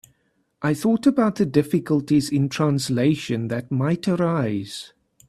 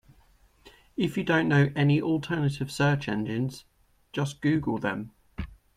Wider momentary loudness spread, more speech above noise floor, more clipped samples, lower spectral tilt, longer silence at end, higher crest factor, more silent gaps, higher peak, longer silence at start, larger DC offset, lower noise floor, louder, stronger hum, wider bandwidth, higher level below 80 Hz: second, 7 LU vs 17 LU; first, 47 dB vs 34 dB; neither; about the same, -6.5 dB/octave vs -7 dB/octave; first, 0.4 s vs 0.25 s; about the same, 18 dB vs 18 dB; neither; first, -4 dBFS vs -10 dBFS; about the same, 0.6 s vs 0.65 s; neither; first, -68 dBFS vs -60 dBFS; first, -22 LUFS vs -27 LUFS; neither; first, 14 kHz vs 12.5 kHz; about the same, -58 dBFS vs -54 dBFS